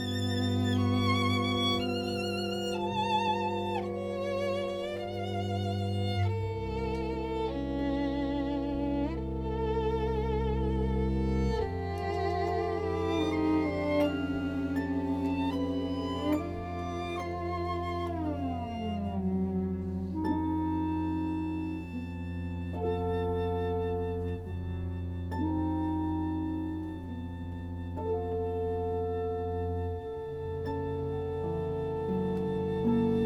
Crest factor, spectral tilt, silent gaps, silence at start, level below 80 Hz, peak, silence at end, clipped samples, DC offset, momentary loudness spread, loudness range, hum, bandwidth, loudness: 16 dB; -7 dB/octave; none; 0 s; -44 dBFS; -16 dBFS; 0 s; under 0.1%; under 0.1%; 8 LU; 4 LU; none; 13.5 kHz; -32 LUFS